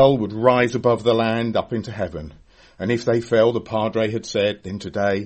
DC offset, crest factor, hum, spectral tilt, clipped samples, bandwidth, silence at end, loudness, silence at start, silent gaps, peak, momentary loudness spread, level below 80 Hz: under 0.1%; 20 dB; none; -6 dB/octave; under 0.1%; 8.6 kHz; 0 s; -21 LUFS; 0 s; none; 0 dBFS; 12 LU; -50 dBFS